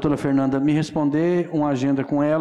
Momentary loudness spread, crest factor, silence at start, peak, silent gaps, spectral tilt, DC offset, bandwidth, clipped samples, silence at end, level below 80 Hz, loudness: 2 LU; 8 dB; 0 s; -12 dBFS; none; -8 dB/octave; under 0.1%; 10.5 kHz; under 0.1%; 0 s; -52 dBFS; -21 LUFS